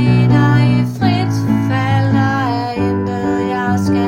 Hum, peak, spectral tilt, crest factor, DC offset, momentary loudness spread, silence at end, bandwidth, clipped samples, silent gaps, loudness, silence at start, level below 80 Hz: none; 0 dBFS; -7.5 dB/octave; 12 dB; under 0.1%; 6 LU; 0 s; 10.5 kHz; under 0.1%; none; -15 LUFS; 0 s; -42 dBFS